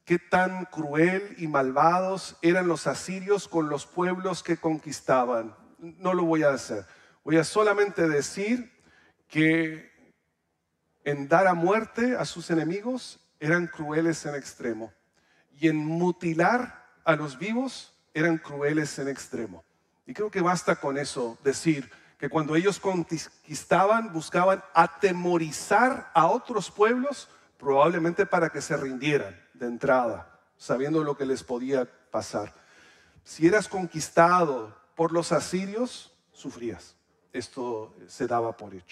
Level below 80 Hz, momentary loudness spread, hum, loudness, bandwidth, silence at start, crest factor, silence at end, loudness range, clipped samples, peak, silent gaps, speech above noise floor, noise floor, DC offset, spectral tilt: -68 dBFS; 15 LU; none; -26 LUFS; 13 kHz; 0.05 s; 22 dB; 0.1 s; 5 LU; under 0.1%; -4 dBFS; none; 51 dB; -77 dBFS; under 0.1%; -5.5 dB/octave